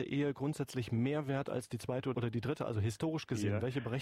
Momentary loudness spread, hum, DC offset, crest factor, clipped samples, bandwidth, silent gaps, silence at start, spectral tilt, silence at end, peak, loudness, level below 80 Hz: 4 LU; none; under 0.1%; 12 dB; under 0.1%; 14.5 kHz; none; 0 s; -7 dB/octave; 0 s; -24 dBFS; -37 LUFS; -66 dBFS